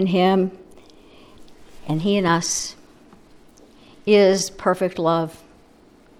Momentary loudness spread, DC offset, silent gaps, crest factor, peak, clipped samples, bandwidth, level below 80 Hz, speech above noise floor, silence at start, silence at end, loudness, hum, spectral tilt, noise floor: 14 LU; under 0.1%; none; 18 dB; -4 dBFS; under 0.1%; 15 kHz; -54 dBFS; 32 dB; 0 s; 0.85 s; -20 LUFS; none; -4.5 dB/octave; -51 dBFS